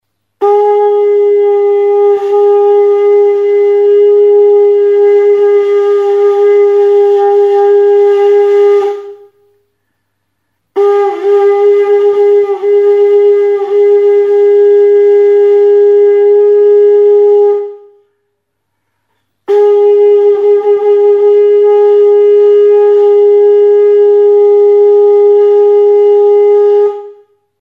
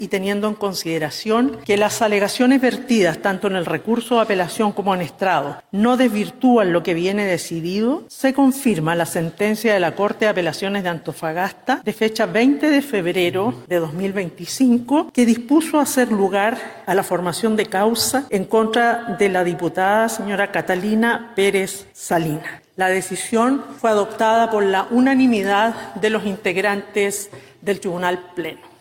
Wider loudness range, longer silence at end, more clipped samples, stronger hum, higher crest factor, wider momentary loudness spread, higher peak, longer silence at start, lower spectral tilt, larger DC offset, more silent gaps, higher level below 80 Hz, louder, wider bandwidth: first, 5 LU vs 2 LU; first, 0.5 s vs 0.15 s; neither; neither; second, 6 dB vs 14 dB; second, 3 LU vs 7 LU; first, 0 dBFS vs -4 dBFS; first, 0.4 s vs 0 s; about the same, -5 dB/octave vs -4.5 dB/octave; neither; neither; second, -70 dBFS vs -60 dBFS; first, -7 LUFS vs -19 LUFS; second, 3.7 kHz vs 17.5 kHz